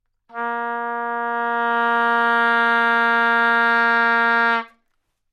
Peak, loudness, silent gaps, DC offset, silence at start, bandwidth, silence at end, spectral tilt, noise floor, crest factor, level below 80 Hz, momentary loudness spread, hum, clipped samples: -6 dBFS; -18 LUFS; none; under 0.1%; 0.35 s; 13 kHz; 0.65 s; -4 dB/octave; -70 dBFS; 14 dB; -76 dBFS; 9 LU; none; under 0.1%